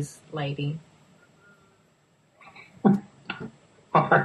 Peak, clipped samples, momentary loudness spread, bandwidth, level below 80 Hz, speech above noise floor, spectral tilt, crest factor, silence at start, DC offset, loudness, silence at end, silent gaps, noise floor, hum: -6 dBFS; under 0.1%; 23 LU; 12 kHz; -68 dBFS; 39 dB; -7 dB/octave; 22 dB; 0 s; under 0.1%; -27 LUFS; 0 s; none; -64 dBFS; none